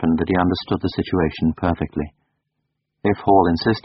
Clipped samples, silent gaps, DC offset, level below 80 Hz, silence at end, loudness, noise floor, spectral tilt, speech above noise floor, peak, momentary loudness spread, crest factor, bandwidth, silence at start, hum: under 0.1%; none; under 0.1%; -40 dBFS; 0.05 s; -20 LUFS; -76 dBFS; -5.5 dB/octave; 57 dB; -2 dBFS; 10 LU; 18 dB; 6 kHz; 0 s; none